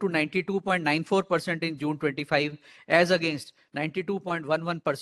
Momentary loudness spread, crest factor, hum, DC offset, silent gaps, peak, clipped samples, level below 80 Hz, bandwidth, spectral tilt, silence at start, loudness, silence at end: 9 LU; 22 dB; none; under 0.1%; none; -6 dBFS; under 0.1%; -70 dBFS; 12.5 kHz; -5.5 dB/octave; 0 s; -27 LUFS; 0 s